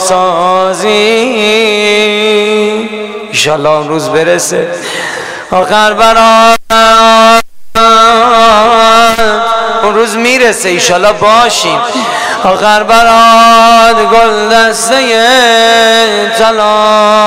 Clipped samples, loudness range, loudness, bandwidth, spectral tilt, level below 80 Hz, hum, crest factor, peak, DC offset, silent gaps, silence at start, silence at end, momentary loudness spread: 2%; 5 LU; -6 LUFS; 16.5 kHz; -2.5 dB/octave; -36 dBFS; none; 6 dB; 0 dBFS; under 0.1%; none; 0 s; 0 s; 8 LU